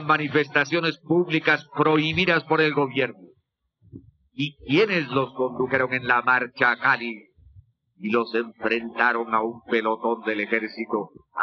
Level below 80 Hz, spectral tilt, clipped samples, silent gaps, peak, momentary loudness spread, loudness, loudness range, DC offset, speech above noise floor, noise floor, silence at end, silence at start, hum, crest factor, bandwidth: -60 dBFS; -6 dB/octave; under 0.1%; none; -4 dBFS; 9 LU; -23 LUFS; 3 LU; under 0.1%; 47 dB; -70 dBFS; 0 s; 0 s; none; 20 dB; 6.8 kHz